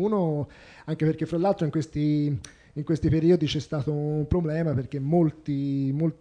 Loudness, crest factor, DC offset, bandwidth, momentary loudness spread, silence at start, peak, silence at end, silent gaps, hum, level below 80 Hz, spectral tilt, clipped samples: -26 LUFS; 16 dB; under 0.1%; 9.8 kHz; 10 LU; 0 s; -10 dBFS; 0.05 s; none; none; -46 dBFS; -8 dB/octave; under 0.1%